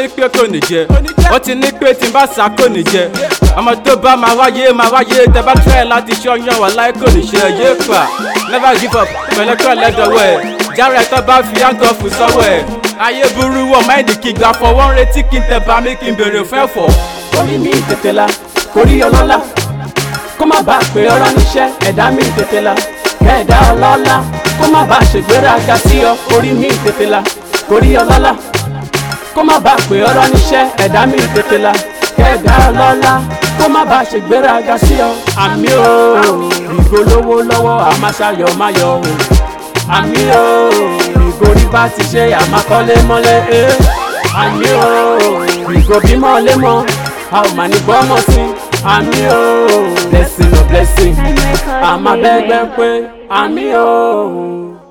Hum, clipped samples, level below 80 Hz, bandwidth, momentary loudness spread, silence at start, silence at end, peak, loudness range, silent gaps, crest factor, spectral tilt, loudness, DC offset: none; 1%; -16 dBFS; 19.5 kHz; 6 LU; 0 s; 0.15 s; 0 dBFS; 2 LU; none; 8 dB; -5 dB/octave; -9 LUFS; under 0.1%